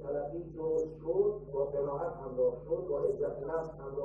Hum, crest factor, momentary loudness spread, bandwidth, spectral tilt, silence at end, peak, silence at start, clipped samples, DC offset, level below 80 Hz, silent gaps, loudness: none; 16 dB; 6 LU; 7.2 kHz; -10 dB/octave; 0 s; -18 dBFS; 0 s; under 0.1%; under 0.1%; -56 dBFS; none; -35 LUFS